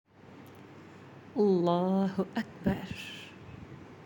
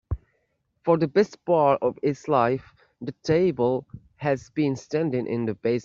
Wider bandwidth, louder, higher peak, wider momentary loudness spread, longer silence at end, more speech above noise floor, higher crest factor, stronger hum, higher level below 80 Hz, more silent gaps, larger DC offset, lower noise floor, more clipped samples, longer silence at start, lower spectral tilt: first, 17 kHz vs 7.6 kHz; second, -31 LUFS vs -24 LUFS; second, -14 dBFS vs -6 dBFS; first, 24 LU vs 11 LU; about the same, 0 s vs 0 s; second, 23 dB vs 49 dB; about the same, 18 dB vs 18 dB; neither; second, -62 dBFS vs -48 dBFS; neither; neither; second, -52 dBFS vs -72 dBFS; neither; first, 0.25 s vs 0.1 s; about the same, -7.5 dB/octave vs -7.5 dB/octave